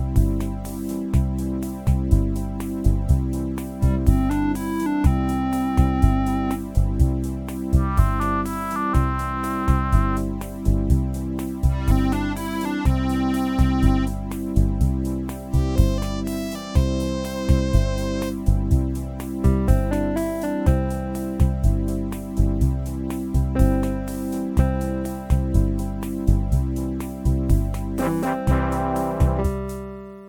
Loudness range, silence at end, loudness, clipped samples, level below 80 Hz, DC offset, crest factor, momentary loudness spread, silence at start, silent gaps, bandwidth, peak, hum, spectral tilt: 2 LU; 0 s; -23 LUFS; under 0.1%; -24 dBFS; under 0.1%; 18 dB; 7 LU; 0 s; none; 18.5 kHz; -2 dBFS; none; -7.5 dB/octave